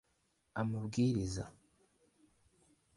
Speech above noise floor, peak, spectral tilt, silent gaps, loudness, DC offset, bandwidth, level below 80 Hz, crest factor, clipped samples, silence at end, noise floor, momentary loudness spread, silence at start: 43 dB; -22 dBFS; -6.5 dB/octave; none; -37 LUFS; under 0.1%; 11.5 kHz; -60 dBFS; 18 dB; under 0.1%; 1.45 s; -78 dBFS; 13 LU; 0.55 s